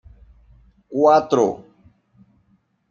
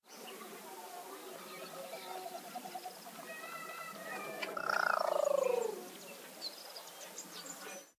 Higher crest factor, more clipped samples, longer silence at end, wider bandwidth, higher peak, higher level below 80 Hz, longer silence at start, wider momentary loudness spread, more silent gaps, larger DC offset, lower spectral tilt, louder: about the same, 20 dB vs 22 dB; neither; first, 1.3 s vs 0.05 s; second, 7.4 kHz vs 16 kHz; first, -2 dBFS vs -18 dBFS; first, -56 dBFS vs under -90 dBFS; first, 0.9 s vs 0.05 s; about the same, 15 LU vs 16 LU; neither; neither; first, -6 dB/octave vs -2 dB/octave; first, -18 LUFS vs -40 LUFS